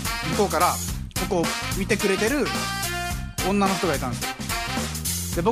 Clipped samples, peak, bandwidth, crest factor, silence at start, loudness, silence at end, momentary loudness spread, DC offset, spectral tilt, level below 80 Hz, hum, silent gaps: under 0.1%; -6 dBFS; 15.5 kHz; 18 dB; 0 s; -24 LUFS; 0 s; 7 LU; under 0.1%; -4 dB/octave; -38 dBFS; none; none